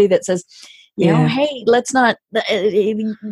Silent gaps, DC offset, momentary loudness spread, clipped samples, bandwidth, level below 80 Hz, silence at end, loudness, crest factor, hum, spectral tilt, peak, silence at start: none; under 0.1%; 8 LU; under 0.1%; 12 kHz; -58 dBFS; 0 s; -17 LUFS; 16 dB; none; -5.5 dB/octave; -2 dBFS; 0 s